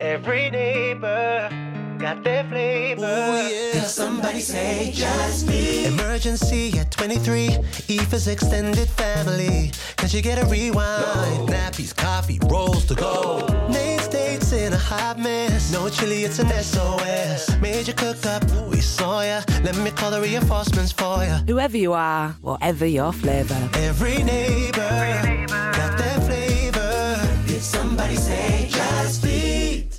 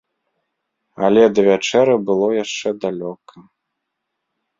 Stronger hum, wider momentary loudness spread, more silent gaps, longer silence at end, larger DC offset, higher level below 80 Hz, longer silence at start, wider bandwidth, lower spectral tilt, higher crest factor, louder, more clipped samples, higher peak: neither; second, 3 LU vs 11 LU; neither; second, 0 s vs 1.2 s; neither; first, -28 dBFS vs -62 dBFS; second, 0 s vs 1 s; first, 17 kHz vs 7.6 kHz; about the same, -5 dB/octave vs -5 dB/octave; about the same, 14 dB vs 18 dB; second, -22 LUFS vs -16 LUFS; neither; second, -8 dBFS vs -2 dBFS